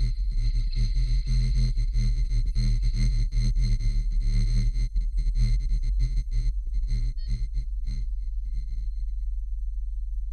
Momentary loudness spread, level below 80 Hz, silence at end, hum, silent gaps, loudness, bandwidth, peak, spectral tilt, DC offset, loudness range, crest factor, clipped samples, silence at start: 8 LU; -24 dBFS; 0 s; none; none; -30 LUFS; 8.8 kHz; -14 dBFS; -6 dB/octave; under 0.1%; 6 LU; 10 dB; under 0.1%; 0 s